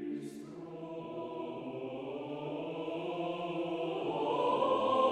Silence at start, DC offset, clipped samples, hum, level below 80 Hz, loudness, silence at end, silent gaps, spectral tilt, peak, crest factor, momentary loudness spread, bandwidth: 0 s; under 0.1%; under 0.1%; none; -76 dBFS; -36 LUFS; 0 s; none; -6.5 dB/octave; -18 dBFS; 18 dB; 14 LU; 11.5 kHz